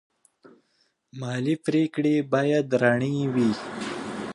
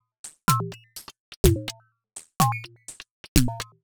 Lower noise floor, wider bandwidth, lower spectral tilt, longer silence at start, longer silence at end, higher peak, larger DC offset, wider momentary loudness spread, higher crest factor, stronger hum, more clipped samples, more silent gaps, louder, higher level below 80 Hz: first, -70 dBFS vs -48 dBFS; second, 11 kHz vs over 20 kHz; first, -6.5 dB/octave vs -4.5 dB/octave; first, 1.15 s vs 0.25 s; second, 0 s vs 0.2 s; second, -6 dBFS vs 0 dBFS; neither; second, 11 LU vs 21 LU; second, 20 dB vs 26 dB; neither; neither; second, none vs 1.20-1.44 s, 3.11-3.35 s; about the same, -25 LUFS vs -25 LUFS; second, -66 dBFS vs -34 dBFS